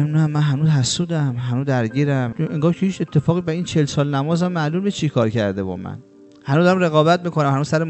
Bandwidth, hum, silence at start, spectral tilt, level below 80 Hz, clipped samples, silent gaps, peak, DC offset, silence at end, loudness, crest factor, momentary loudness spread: 8.4 kHz; none; 0 s; -6.5 dB/octave; -54 dBFS; under 0.1%; none; -2 dBFS; under 0.1%; 0 s; -19 LUFS; 16 dB; 7 LU